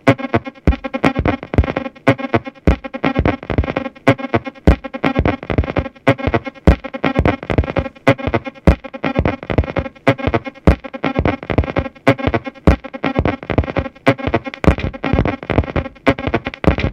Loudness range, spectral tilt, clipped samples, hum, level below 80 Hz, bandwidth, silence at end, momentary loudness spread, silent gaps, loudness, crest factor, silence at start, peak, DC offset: 1 LU; -8 dB/octave; under 0.1%; none; -24 dBFS; 9.8 kHz; 0 s; 5 LU; none; -18 LUFS; 16 dB; 0.05 s; 0 dBFS; under 0.1%